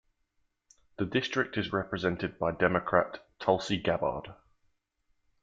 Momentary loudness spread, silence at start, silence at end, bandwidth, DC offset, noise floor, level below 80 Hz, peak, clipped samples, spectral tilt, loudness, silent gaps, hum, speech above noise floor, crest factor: 8 LU; 1 s; 1.1 s; 9 kHz; under 0.1%; -76 dBFS; -60 dBFS; -8 dBFS; under 0.1%; -6 dB/octave; -30 LUFS; none; none; 46 dB; 24 dB